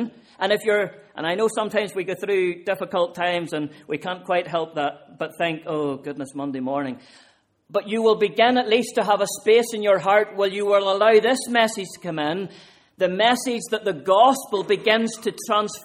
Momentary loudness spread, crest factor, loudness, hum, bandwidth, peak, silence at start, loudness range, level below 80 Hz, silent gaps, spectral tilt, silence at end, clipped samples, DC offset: 12 LU; 18 dB; -22 LUFS; none; 16 kHz; -4 dBFS; 0 s; 7 LU; -70 dBFS; none; -3.5 dB/octave; 0 s; under 0.1%; under 0.1%